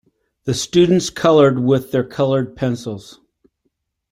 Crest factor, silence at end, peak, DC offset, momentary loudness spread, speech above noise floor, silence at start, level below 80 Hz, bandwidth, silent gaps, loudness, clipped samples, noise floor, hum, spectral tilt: 16 dB; 1 s; -2 dBFS; under 0.1%; 14 LU; 55 dB; 0.45 s; -52 dBFS; 16 kHz; none; -16 LUFS; under 0.1%; -71 dBFS; none; -6 dB/octave